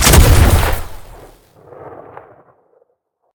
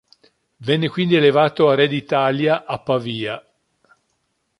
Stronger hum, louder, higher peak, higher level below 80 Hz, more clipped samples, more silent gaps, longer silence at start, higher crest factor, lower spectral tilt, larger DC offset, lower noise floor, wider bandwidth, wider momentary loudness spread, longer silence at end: neither; first, -12 LUFS vs -18 LUFS; about the same, 0 dBFS vs -2 dBFS; first, -18 dBFS vs -62 dBFS; first, 0.3% vs under 0.1%; neither; second, 0 s vs 0.6 s; about the same, 14 dB vs 18 dB; second, -4 dB/octave vs -7.5 dB/octave; neither; second, -65 dBFS vs -70 dBFS; first, over 20 kHz vs 11 kHz; first, 27 LU vs 11 LU; first, 1.45 s vs 1.2 s